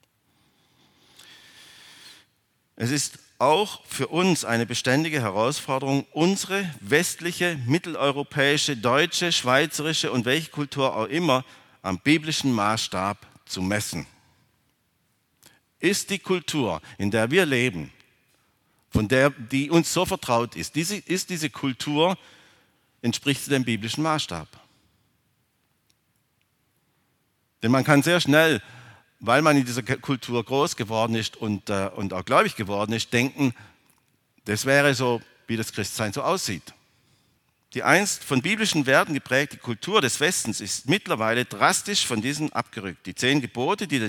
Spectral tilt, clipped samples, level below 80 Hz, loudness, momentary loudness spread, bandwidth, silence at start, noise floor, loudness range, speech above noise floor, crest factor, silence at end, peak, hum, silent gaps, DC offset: -4 dB/octave; under 0.1%; -58 dBFS; -24 LUFS; 10 LU; 19 kHz; 2.05 s; -70 dBFS; 6 LU; 46 dB; 24 dB; 0 s; -2 dBFS; none; none; under 0.1%